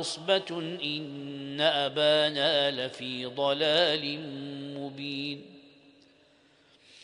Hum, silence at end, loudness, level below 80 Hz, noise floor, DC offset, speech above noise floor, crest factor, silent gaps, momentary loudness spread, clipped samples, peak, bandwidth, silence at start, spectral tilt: none; 0 s; -28 LUFS; -76 dBFS; -62 dBFS; under 0.1%; 33 dB; 20 dB; none; 15 LU; under 0.1%; -10 dBFS; 10.5 kHz; 0 s; -4 dB/octave